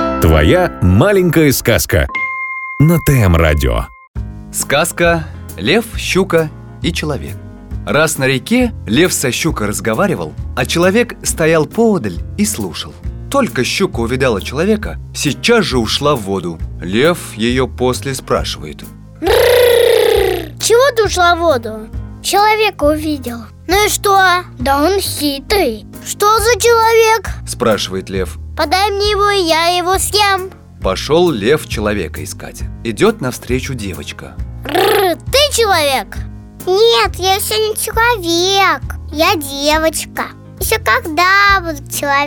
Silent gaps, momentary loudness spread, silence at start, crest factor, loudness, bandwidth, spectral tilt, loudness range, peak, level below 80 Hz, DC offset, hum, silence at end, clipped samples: 4.08-4.14 s; 14 LU; 0 s; 12 dB; -13 LUFS; over 20 kHz; -4 dB/octave; 4 LU; 0 dBFS; -28 dBFS; under 0.1%; none; 0 s; under 0.1%